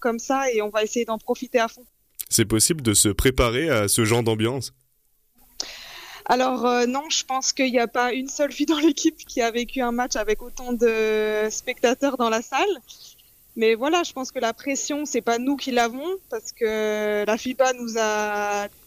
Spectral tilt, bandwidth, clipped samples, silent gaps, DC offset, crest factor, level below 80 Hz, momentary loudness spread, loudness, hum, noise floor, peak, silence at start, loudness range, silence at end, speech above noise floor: -3.5 dB/octave; 15.5 kHz; under 0.1%; none; under 0.1%; 18 dB; -42 dBFS; 9 LU; -23 LUFS; none; -66 dBFS; -6 dBFS; 0 s; 4 LU; 0.2 s; 43 dB